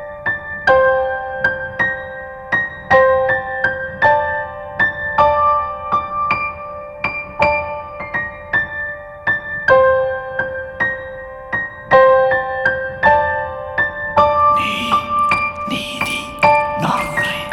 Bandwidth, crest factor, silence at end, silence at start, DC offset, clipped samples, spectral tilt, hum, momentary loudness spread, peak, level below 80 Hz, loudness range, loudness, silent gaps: 13.5 kHz; 16 dB; 0 s; 0 s; under 0.1%; under 0.1%; -4.5 dB/octave; none; 11 LU; 0 dBFS; -42 dBFS; 3 LU; -16 LUFS; none